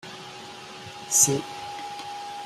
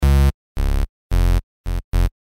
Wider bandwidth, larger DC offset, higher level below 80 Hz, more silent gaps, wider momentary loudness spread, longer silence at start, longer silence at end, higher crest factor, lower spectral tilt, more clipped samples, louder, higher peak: about the same, 15.5 kHz vs 16 kHz; neither; second, -66 dBFS vs -18 dBFS; second, none vs 0.34-0.55 s, 0.89-1.10 s, 1.43-1.64 s, 1.84-1.92 s; first, 21 LU vs 10 LU; about the same, 0 s vs 0 s; second, 0 s vs 0.15 s; first, 24 dB vs 10 dB; second, -2 dB/octave vs -6.5 dB/octave; neither; about the same, -24 LUFS vs -22 LUFS; about the same, -4 dBFS vs -6 dBFS